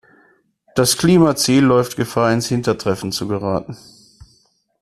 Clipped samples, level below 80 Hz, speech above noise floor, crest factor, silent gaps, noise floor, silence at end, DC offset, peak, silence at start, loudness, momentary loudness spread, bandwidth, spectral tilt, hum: under 0.1%; -48 dBFS; 43 dB; 16 dB; none; -59 dBFS; 1.05 s; under 0.1%; -2 dBFS; 0.75 s; -17 LUFS; 11 LU; 14 kHz; -5 dB/octave; none